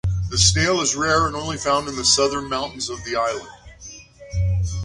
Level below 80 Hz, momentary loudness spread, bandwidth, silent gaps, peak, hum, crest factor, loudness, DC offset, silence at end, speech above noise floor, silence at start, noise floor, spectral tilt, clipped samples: -34 dBFS; 15 LU; 11.5 kHz; none; -2 dBFS; none; 20 dB; -20 LUFS; under 0.1%; 0 s; 21 dB; 0.05 s; -42 dBFS; -3 dB/octave; under 0.1%